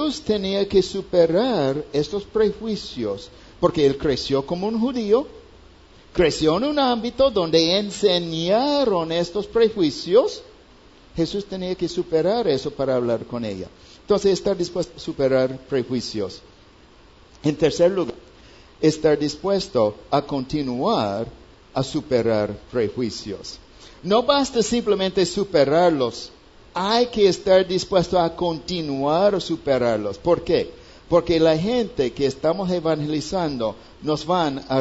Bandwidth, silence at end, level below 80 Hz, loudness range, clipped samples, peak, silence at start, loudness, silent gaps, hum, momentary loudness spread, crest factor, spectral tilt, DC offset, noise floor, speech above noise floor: 8 kHz; 0 s; -48 dBFS; 4 LU; under 0.1%; -2 dBFS; 0 s; -21 LUFS; none; none; 10 LU; 18 dB; -5.5 dB/octave; under 0.1%; -50 dBFS; 29 dB